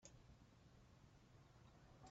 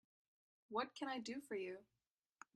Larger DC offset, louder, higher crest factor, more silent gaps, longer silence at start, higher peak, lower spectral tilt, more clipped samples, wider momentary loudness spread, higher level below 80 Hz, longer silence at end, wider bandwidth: neither; second, -69 LUFS vs -47 LUFS; about the same, 20 dB vs 22 dB; neither; second, 0 s vs 0.7 s; second, -46 dBFS vs -28 dBFS; first, -5.5 dB/octave vs -3.5 dB/octave; neither; second, 3 LU vs 10 LU; first, -74 dBFS vs -90 dBFS; second, 0 s vs 0.7 s; second, 7.6 kHz vs 13 kHz